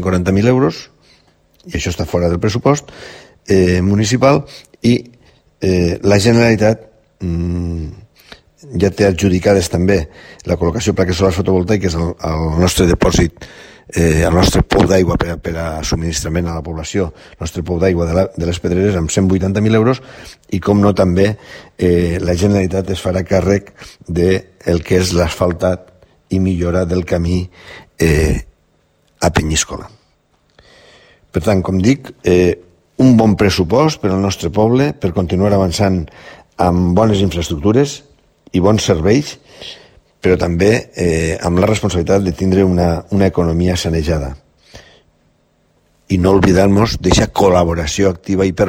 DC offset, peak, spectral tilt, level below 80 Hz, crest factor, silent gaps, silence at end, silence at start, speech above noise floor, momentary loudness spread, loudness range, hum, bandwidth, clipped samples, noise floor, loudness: under 0.1%; 0 dBFS; -6 dB/octave; -30 dBFS; 14 dB; none; 0 s; 0 s; 44 dB; 11 LU; 4 LU; none; 16.5 kHz; under 0.1%; -57 dBFS; -15 LUFS